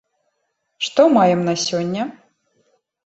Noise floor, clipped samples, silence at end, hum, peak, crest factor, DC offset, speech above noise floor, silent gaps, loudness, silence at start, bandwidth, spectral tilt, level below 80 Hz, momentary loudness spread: -72 dBFS; under 0.1%; 0.95 s; none; -2 dBFS; 18 dB; under 0.1%; 56 dB; none; -18 LUFS; 0.8 s; 8.2 kHz; -5 dB/octave; -62 dBFS; 13 LU